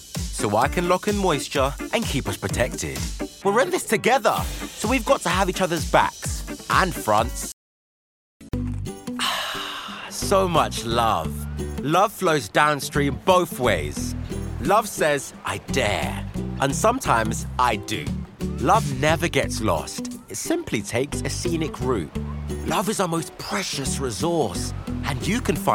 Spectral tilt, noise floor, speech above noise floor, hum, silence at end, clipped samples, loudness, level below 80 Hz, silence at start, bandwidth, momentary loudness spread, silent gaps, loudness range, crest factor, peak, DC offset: -4.5 dB/octave; under -90 dBFS; over 68 dB; none; 0 s; under 0.1%; -23 LUFS; -38 dBFS; 0 s; 17 kHz; 11 LU; 7.53-8.40 s; 4 LU; 20 dB; -2 dBFS; under 0.1%